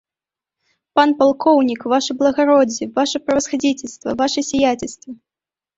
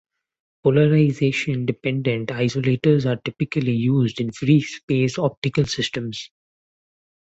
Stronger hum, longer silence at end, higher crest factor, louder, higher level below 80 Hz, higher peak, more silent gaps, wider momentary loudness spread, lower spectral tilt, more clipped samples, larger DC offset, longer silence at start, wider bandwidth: neither; second, 0.65 s vs 1.1 s; about the same, 16 dB vs 18 dB; first, -17 LUFS vs -21 LUFS; about the same, -54 dBFS vs -54 dBFS; about the same, -2 dBFS vs -4 dBFS; second, none vs 4.83-4.88 s, 5.37-5.42 s; first, 11 LU vs 7 LU; second, -3 dB/octave vs -6.5 dB/octave; neither; neither; first, 0.95 s vs 0.65 s; about the same, 8 kHz vs 8 kHz